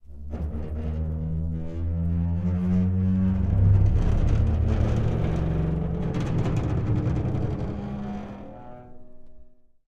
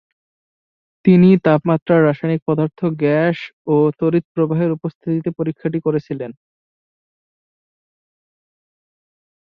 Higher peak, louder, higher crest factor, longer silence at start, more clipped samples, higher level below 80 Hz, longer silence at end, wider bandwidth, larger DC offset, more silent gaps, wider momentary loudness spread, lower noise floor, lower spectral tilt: second, -10 dBFS vs -2 dBFS; second, -26 LUFS vs -17 LUFS; about the same, 16 dB vs 18 dB; second, 0.1 s vs 1.05 s; neither; first, -30 dBFS vs -60 dBFS; second, 0.35 s vs 3.25 s; first, 7.2 kHz vs 5 kHz; neither; second, none vs 1.82-1.86 s, 2.42-2.46 s, 3.53-3.65 s, 4.24-4.35 s, 4.95-5.01 s; about the same, 11 LU vs 11 LU; second, -47 dBFS vs under -90 dBFS; about the same, -9.5 dB/octave vs -10.5 dB/octave